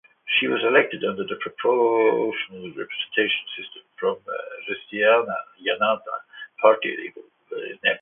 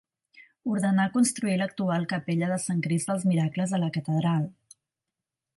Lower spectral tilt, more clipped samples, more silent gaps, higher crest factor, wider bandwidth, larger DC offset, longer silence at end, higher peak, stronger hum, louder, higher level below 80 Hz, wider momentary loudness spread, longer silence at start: first, -8 dB/octave vs -6 dB/octave; neither; neither; first, 22 dB vs 14 dB; second, 3.9 kHz vs 11.5 kHz; neither; second, 0.05 s vs 1.05 s; first, -2 dBFS vs -12 dBFS; neither; first, -23 LUFS vs -27 LUFS; about the same, -72 dBFS vs -72 dBFS; first, 15 LU vs 4 LU; about the same, 0.25 s vs 0.35 s